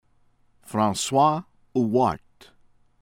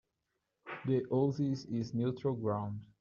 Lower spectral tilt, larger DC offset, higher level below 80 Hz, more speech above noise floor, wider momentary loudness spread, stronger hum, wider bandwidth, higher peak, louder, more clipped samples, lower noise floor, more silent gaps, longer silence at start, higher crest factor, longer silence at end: second, -5 dB/octave vs -8 dB/octave; neither; first, -58 dBFS vs -72 dBFS; second, 40 dB vs 51 dB; about the same, 11 LU vs 11 LU; neither; first, 17 kHz vs 7.2 kHz; first, -8 dBFS vs -20 dBFS; first, -23 LUFS vs -35 LUFS; neither; second, -61 dBFS vs -85 dBFS; neither; about the same, 0.7 s vs 0.65 s; about the same, 18 dB vs 16 dB; first, 0.85 s vs 0.15 s